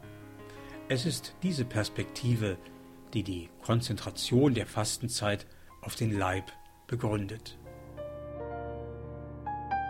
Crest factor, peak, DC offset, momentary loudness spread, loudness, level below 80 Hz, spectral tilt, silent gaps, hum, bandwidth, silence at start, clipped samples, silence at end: 20 dB; -14 dBFS; under 0.1%; 18 LU; -33 LUFS; -54 dBFS; -5 dB/octave; none; none; 16.5 kHz; 0 s; under 0.1%; 0 s